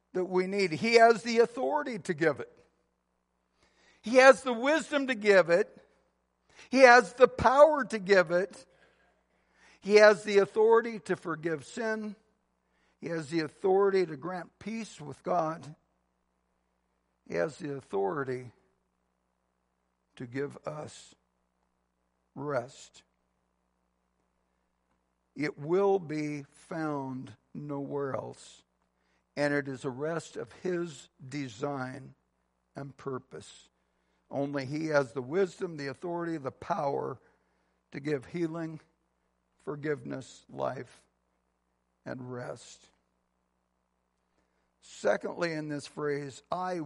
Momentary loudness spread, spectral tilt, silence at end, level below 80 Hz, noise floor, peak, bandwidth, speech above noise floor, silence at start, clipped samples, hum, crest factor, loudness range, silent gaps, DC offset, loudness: 21 LU; -5 dB/octave; 0 s; -68 dBFS; -78 dBFS; -4 dBFS; 11.5 kHz; 49 dB; 0.15 s; under 0.1%; none; 26 dB; 19 LU; none; under 0.1%; -28 LUFS